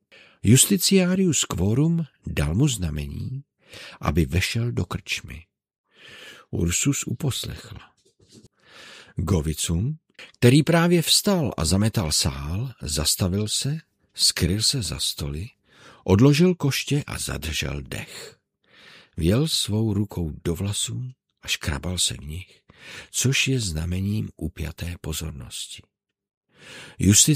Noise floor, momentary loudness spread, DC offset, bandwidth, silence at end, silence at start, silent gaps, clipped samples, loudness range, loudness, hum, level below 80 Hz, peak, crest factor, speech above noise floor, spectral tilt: -55 dBFS; 21 LU; under 0.1%; 16 kHz; 0 s; 0.45 s; 5.78-5.84 s, 26.37-26.41 s; under 0.1%; 8 LU; -23 LUFS; none; -40 dBFS; -2 dBFS; 22 dB; 33 dB; -4 dB/octave